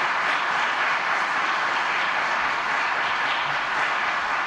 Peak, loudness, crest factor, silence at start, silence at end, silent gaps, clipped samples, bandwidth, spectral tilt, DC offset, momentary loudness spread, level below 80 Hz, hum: -10 dBFS; -22 LUFS; 14 dB; 0 s; 0 s; none; under 0.1%; 13.5 kHz; -1.5 dB/octave; under 0.1%; 1 LU; -62 dBFS; none